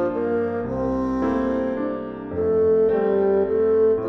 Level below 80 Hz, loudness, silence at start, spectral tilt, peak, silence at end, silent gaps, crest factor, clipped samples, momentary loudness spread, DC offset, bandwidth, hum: -46 dBFS; -22 LUFS; 0 s; -9.5 dB/octave; -10 dBFS; 0 s; none; 10 dB; under 0.1%; 8 LU; under 0.1%; 5.8 kHz; none